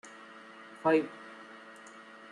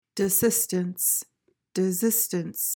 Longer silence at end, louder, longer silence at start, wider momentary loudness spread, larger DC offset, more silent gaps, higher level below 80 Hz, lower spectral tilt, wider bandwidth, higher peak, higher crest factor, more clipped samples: first, 0.3 s vs 0 s; second, -30 LUFS vs -24 LUFS; about the same, 0.05 s vs 0.15 s; first, 22 LU vs 6 LU; neither; neither; second, -80 dBFS vs -66 dBFS; first, -6 dB/octave vs -4 dB/octave; second, 11 kHz vs 18 kHz; second, -14 dBFS vs -10 dBFS; first, 22 dB vs 16 dB; neither